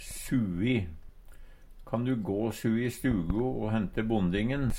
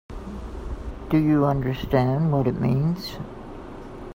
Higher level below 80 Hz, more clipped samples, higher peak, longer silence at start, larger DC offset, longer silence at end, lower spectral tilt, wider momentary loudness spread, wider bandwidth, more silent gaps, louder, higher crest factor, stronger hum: about the same, -42 dBFS vs -38 dBFS; neither; second, -14 dBFS vs -6 dBFS; about the same, 0 s vs 0.1 s; neither; about the same, 0 s vs 0 s; second, -6.5 dB/octave vs -8.5 dB/octave; second, 3 LU vs 19 LU; about the same, 16.5 kHz vs 16 kHz; neither; second, -30 LUFS vs -23 LUFS; about the same, 16 dB vs 18 dB; neither